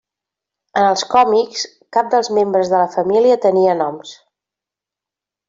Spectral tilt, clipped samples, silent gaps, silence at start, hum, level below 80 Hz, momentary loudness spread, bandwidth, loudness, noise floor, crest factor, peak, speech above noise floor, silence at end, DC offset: -4 dB/octave; under 0.1%; none; 0.75 s; none; -62 dBFS; 10 LU; 7.8 kHz; -15 LUFS; -87 dBFS; 16 dB; 0 dBFS; 72 dB; 1.35 s; under 0.1%